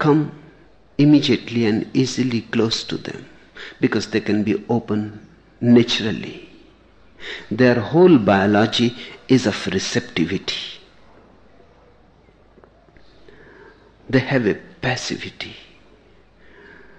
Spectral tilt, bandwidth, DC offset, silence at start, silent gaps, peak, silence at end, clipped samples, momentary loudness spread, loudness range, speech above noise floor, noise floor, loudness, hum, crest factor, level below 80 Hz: -5.5 dB/octave; 9 kHz; under 0.1%; 0 s; none; -2 dBFS; 1.4 s; under 0.1%; 19 LU; 9 LU; 34 dB; -52 dBFS; -19 LUFS; none; 18 dB; -54 dBFS